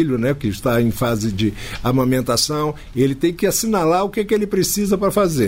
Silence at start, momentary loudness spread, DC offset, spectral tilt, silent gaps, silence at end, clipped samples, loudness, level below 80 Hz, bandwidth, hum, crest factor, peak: 0 s; 4 LU; under 0.1%; -5 dB/octave; none; 0 s; under 0.1%; -19 LUFS; -38 dBFS; 16.5 kHz; none; 12 dB; -6 dBFS